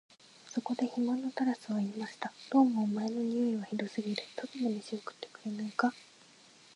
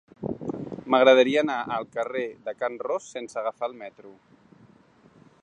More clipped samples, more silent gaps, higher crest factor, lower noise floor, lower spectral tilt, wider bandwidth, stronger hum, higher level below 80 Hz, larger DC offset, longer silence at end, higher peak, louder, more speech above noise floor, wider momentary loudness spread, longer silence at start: neither; neither; about the same, 20 dB vs 22 dB; about the same, -60 dBFS vs -57 dBFS; about the same, -6 dB/octave vs -5 dB/octave; first, 11 kHz vs 9.6 kHz; neither; second, -86 dBFS vs -66 dBFS; neither; second, 0.75 s vs 1.3 s; second, -14 dBFS vs -4 dBFS; second, -34 LUFS vs -25 LUFS; second, 26 dB vs 32 dB; second, 13 LU vs 17 LU; first, 0.45 s vs 0.2 s